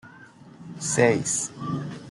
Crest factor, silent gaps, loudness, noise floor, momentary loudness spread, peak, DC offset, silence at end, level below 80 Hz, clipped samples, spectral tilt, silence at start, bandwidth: 22 dB; none; -25 LUFS; -48 dBFS; 18 LU; -4 dBFS; under 0.1%; 0 s; -64 dBFS; under 0.1%; -4 dB/octave; 0.05 s; 12 kHz